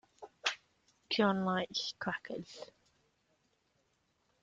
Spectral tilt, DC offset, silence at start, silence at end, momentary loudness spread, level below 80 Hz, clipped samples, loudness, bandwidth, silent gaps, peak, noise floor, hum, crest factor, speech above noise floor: -4.5 dB/octave; under 0.1%; 0.2 s; 1.75 s; 19 LU; -76 dBFS; under 0.1%; -36 LUFS; 7.8 kHz; none; -16 dBFS; -77 dBFS; none; 24 dB; 42 dB